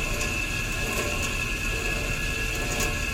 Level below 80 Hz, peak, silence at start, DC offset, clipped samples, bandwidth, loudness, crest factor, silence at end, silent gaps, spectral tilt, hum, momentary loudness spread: -32 dBFS; -14 dBFS; 0 s; under 0.1%; under 0.1%; 17 kHz; -27 LUFS; 14 dB; 0 s; none; -3 dB/octave; none; 1 LU